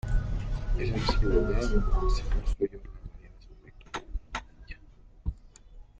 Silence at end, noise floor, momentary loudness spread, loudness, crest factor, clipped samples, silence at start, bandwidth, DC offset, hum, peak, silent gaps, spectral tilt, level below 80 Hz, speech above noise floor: 0.2 s; -53 dBFS; 21 LU; -32 LUFS; 18 dB; under 0.1%; 0.05 s; 7.8 kHz; under 0.1%; none; -12 dBFS; none; -6.5 dB/octave; -30 dBFS; 27 dB